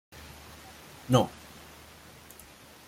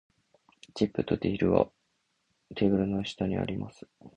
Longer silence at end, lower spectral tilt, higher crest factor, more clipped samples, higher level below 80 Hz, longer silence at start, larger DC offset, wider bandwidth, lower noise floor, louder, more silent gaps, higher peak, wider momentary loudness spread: first, 1.6 s vs 0.1 s; second, -6 dB/octave vs -7.5 dB/octave; about the same, 24 dB vs 24 dB; neither; second, -60 dBFS vs -52 dBFS; second, 0.15 s vs 0.75 s; neither; first, 16.5 kHz vs 9.2 kHz; second, -52 dBFS vs -76 dBFS; about the same, -27 LUFS vs -29 LUFS; neither; second, -10 dBFS vs -6 dBFS; first, 24 LU vs 13 LU